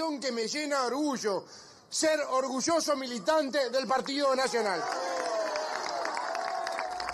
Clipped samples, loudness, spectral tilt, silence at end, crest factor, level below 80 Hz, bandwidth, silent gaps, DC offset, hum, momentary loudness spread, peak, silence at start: under 0.1%; -30 LUFS; -2 dB/octave; 0 s; 16 dB; -72 dBFS; 13 kHz; none; under 0.1%; none; 6 LU; -14 dBFS; 0 s